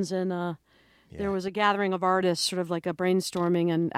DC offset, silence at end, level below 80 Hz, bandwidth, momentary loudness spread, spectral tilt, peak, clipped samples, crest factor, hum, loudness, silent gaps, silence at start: under 0.1%; 0 s; -62 dBFS; 15.5 kHz; 9 LU; -5 dB/octave; -8 dBFS; under 0.1%; 18 dB; none; -27 LUFS; none; 0 s